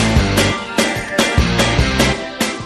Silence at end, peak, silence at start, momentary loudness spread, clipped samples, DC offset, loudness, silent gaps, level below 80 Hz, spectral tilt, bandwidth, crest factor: 0 s; 0 dBFS; 0 s; 3 LU; under 0.1%; under 0.1%; -15 LUFS; none; -24 dBFS; -4 dB/octave; 13.5 kHz; 16 dB